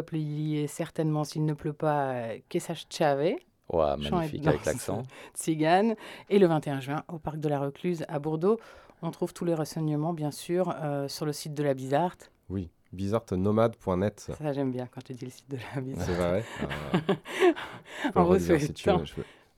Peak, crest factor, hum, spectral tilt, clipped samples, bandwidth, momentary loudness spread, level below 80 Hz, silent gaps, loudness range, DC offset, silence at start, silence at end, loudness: -8 dBFS; 22 dB; none; -6.5 dB/octave; under 0.1%; 17.5 kHz; 13 LU; -56 dBFS; none; 4 LU; under 0.1%; 0 s; 0.25 s; -29 LUFS